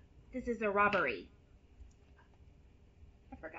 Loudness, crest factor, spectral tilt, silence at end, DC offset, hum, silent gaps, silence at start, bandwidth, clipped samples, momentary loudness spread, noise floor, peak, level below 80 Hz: -34 LUFS; 22 dB; -3 dB/octave; 0 s; under 0.1%; none; none; 0.15 s; 7.6 kHz; under 0.1%; 24 LU; -62 dBFS; -18 dBFS; -60 dBFS